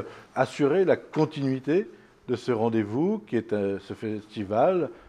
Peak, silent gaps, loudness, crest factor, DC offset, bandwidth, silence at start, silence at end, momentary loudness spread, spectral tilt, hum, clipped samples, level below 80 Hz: -8 dBFS; none; -27 LUFS; 18 dB; under 0.1%; 10.5 kHz; 0 s; 0.1 s; 11 LU; -7.5 dB/octave; none; under 0.1%; -68 dBFS